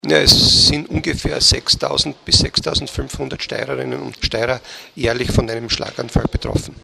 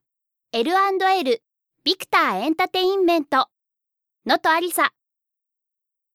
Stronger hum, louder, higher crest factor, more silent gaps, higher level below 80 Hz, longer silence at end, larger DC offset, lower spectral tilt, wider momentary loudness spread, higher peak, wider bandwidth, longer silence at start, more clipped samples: neither; first, -16 LUFS vs -21 LUFS; about the same, 18 dB vs 18 dB; neither; first, -30 dBFS vs -72 dBFS; second, 0.05 s vs 1.25 s; neither; about the same, -3.5 dB/octave vs -2.5 dB/octave; first, 15 LU vs 7 LU; first, 0 dBFS vs -4 dBFS; about the same, 16 kHz vs 17 kHz; second, 0.05 s vs 0.55 s; neither